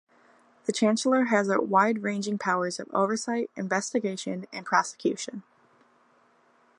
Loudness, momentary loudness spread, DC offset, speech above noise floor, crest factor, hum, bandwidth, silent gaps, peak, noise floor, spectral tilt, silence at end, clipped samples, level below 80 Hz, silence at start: -27 LUFS; 11 LU; under 0.1%; 37 dB; 22 dB; none; 11 kHz; none; -6 dBFS; -63 dBFS; -4.5 dB/octave; 1.4 s; under 0.1%; -80 dBFS; 0.7 s